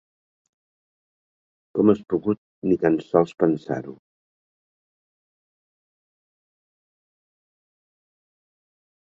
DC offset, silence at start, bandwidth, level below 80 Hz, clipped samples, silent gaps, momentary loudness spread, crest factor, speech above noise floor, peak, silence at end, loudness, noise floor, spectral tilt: under 0.1%; 1.75 s; 7.6 kHz; -62 dBFS; under 0.1%; 2.38-2.62 s; 11 LU; 24 dB; over 69 dB; -4 dBFS; 5.25 s; -23 LUFS; under -90 dBFS; -9 dB/octave